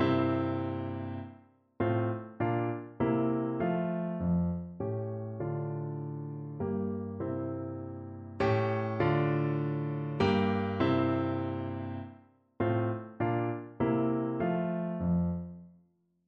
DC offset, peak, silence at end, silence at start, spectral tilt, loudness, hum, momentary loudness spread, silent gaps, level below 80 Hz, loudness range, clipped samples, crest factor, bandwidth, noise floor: under 0.1%; -16 dBFS; 0.55 s; 0 s; -9.5 dB/octave; -32 LUFS; none; 11 LU; none; -58 dBFS; 5 LU; under 0.1%; 16 dB; 6.6 kHz; -69 dBFS